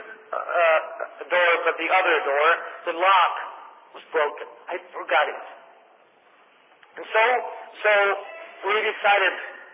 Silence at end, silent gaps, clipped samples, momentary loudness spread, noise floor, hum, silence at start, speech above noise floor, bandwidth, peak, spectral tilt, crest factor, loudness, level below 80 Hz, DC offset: 0.1 s; none; under 0.1%; 16 LU; -56 dBFS; none; 0 s; 34 dB; 3.9 kHz; -8 dBFS; -4 dB/octave; 16 dB; -22 LUFS; under -90 dBFS; under 0.1%